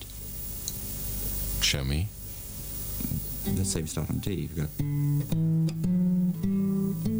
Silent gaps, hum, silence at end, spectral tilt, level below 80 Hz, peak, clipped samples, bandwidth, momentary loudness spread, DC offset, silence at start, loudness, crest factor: none; none; 0 s; -5 dB/octave; -40 dBFS; -12 dBFS; under 0.1%; over 20 kHz; 9 LU; under 0.1%; 0 s; -29 LUFS; 18 dB